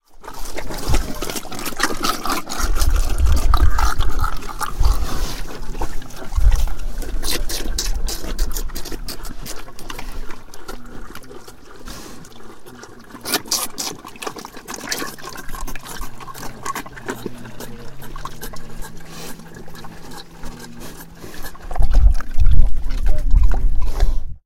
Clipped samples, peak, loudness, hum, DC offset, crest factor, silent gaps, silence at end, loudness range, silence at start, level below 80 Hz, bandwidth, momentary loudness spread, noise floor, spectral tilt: 0.2%; 0 dBFS; -25 LUFS; none; under 0.1%; 16 dB; none; 0.1 s; 14 LU; 0.15 s; -20 dBFS; 16.5 kHz; 18 LU; -37 dBFS; -3.5 dB/octave